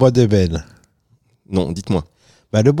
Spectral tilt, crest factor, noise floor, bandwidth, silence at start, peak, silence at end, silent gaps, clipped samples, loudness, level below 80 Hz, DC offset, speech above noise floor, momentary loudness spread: -7.5 dB/octave; 16 dB; -59 dBFS; 11.5 kHz; 0 s; -2 dBFS; 0 s; none; under 0.1%; -18 LUFS; -42 dBFS; under 0.1%; 44 dB; 9 LU